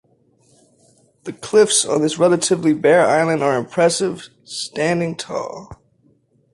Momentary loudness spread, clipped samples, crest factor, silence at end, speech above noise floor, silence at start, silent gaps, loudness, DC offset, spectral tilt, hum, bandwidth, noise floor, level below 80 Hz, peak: 18 LU; under 0.1%; 16 dB; 0.8 s; 41 dB; 1.25 s; none; -17 LUFS; under 0.1%; -4 dB/octave; none; 11.5 kHz; -58 dBFS; -58 dBFS; -2 dBFS